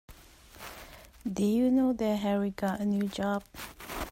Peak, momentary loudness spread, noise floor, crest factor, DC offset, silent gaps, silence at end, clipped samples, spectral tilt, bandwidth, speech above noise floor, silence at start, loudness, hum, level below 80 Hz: -18 dBFS; 19 LU; -53 dBFS; 14 dB; under 0.1%; none; 0 s; under 0.1%; -6.5 dB/octave; 16 kHz; 25 dB; 0.1 s; -30 LUFS; none; -54 dBFS